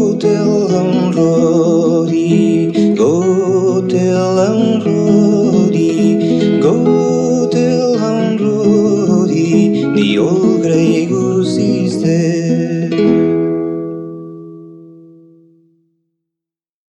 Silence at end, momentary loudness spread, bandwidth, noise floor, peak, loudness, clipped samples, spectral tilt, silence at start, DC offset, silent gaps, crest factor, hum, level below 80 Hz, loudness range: 2.05 s; 4 LU; 9 kHz; -85 dBFS; 0 dBFS; -12 LUFS; under 0.1%; -7 dB/octave; 0 s; under 0.1%; none; 12 dB; none; -54 dBFS; 5 LU